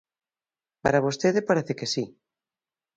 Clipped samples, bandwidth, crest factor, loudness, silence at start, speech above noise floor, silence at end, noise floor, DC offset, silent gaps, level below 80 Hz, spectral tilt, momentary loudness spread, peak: under 0.1%; 9.2 kHz; 22 dB; -25 LUFS; 0.85 s; over 66 dB; 0.9 s; under -90 dBFS; under 0.1%; none; -60 dBFS; -5 dB/octave; 7 LU; -6 dBFS